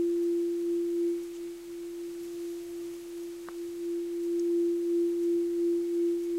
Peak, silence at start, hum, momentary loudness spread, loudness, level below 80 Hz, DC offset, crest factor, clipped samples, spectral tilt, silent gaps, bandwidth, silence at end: -22 dBFS; 0 s; none; 12 LU; -32 LUFS; -68 dBFS; under 0.1%; 8 dB; under 0.1%; -5 dB/octave; none; 15 kHz; 0 s